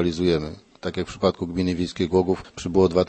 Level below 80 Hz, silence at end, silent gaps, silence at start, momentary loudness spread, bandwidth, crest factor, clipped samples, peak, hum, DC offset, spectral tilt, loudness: -46 dBFS; 0 s; none; 0 s; 9 LU; 8.8 kHz; 18 dB; under 0.1%; -4 dBFS; none; under 0.1%; -6.5 dB/octave; -24 LUFS